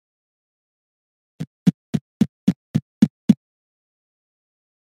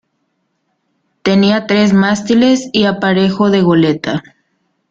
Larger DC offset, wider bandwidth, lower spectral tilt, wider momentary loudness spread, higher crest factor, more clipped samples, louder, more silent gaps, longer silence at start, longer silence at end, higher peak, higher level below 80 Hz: neither; first, 13 kHz vs 7.6 kHz; first, -8 dB/octave vs -6 dB/octave; about the same, 9 LU vs 7 LU; first, 24 dB vs 12 dB; neither; second, -22 LUFS vs -12 LUFS; first, 1.47-1.66 s, 1.74-1.93 s, 2.01-2.20 s, 2.29-2.47 s, 2.56-2.74 s, 2.82-3.01 s, 3.10-3.28 s vs none; first, 1.4 s vs 1.25 s; first, 1.55 s vs 0.7 s; about the same, 0 dBFS vs 0 dBFS; second, -58 dBFS vs -52 dBFS